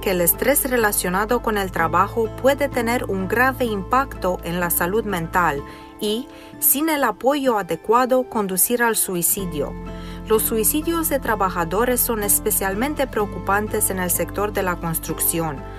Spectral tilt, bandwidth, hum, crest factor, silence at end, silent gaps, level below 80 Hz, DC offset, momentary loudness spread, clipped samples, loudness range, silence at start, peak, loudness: -3.5 dB/octave; 16 kHz; none; 18 dB; 0 s; none; -38 dBFS; under 0.1%; 8 LU; under 0.1%; 2 LU; 0 s; -2 dBFS; -20 LUFS